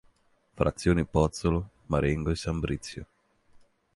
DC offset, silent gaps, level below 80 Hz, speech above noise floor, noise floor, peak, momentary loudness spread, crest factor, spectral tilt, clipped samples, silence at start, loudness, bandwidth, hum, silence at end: under 0.1%; none; -40 dBFS; 39 dB; -66 dBFS; -10 dBFS; 9 LU; 20 dB; -6.5 dB/octave; under 0.1%; 0.55 s; -28 LUFS; 11.5 kHz; none; 0.9 s